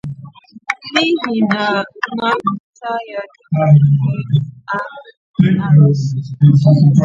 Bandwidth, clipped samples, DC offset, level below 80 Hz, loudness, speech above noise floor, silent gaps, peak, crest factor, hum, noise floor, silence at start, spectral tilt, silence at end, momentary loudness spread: 7.4 kHz; under 0.1%; under 0.1%; -52 dBFS; -14 LUFS; 24 dB; 2.60-2.73 s, 5.17-5.34 s; 0 dBFS; 14 dB; none; -37 dBFS; 0.05 s; -7.5 dB/octave; 0 s; 16 LU